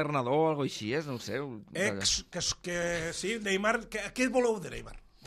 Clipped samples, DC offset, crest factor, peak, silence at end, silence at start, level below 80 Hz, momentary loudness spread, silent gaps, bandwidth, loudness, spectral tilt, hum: under 0.1%; under 0.1%; 18 dB; -14 dBFS; 0 s; 0 s; -54 dBFS; 9 LU; none; 14.5 kHz; -31 LUFS; -3.5 dB/octave; none